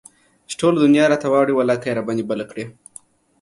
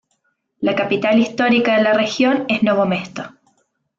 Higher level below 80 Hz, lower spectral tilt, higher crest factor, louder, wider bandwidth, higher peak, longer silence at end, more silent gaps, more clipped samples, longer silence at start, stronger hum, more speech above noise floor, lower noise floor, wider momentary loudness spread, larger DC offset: about the same, -62 dBFS vs -60 dBFS; about the same, -5.5 dB/octave vs -5.5 dB/octave; about the same, 16 dB vs 14 dB; about the same, -18 LUFS vs -17 LUFS; first, 11.5 kHz vs 7.6 kHz; about the same, -4 dBFS vs -4 dBFS; about the same, 0.7 s vs 0.7 s; neither; neither; about the same, 0.5 s vs 0.6 s; neither; second, 29 dB vs 51 dB; second, -47 dBFS vs -68 dBFS; first, 17 LU vs 10 LU; neither